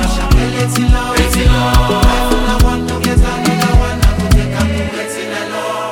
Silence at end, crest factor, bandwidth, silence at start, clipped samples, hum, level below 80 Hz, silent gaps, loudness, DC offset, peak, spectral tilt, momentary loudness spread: 0 s; 12 dB; 17 kHz; 0 s; under 0.1%; none; -14 dBFS; none; -14 LUFS; 0.8%; 0 dBFS; -5 dB/octave; 7 LU